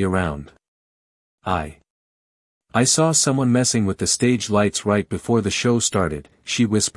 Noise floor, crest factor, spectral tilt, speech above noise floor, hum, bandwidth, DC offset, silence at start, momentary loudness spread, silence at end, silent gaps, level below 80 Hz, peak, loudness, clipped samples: under -90 dBFS; 18 dB; -4 dB/octave; over 70 dB; none; 12 kHz; under 0.1%; 0 s; 10 LU; 0.05 s; 0.68-1.38 s, 1.90-2.61 s; -48 dBFS; -4 dBFS; -19 LUFS; under 0.1%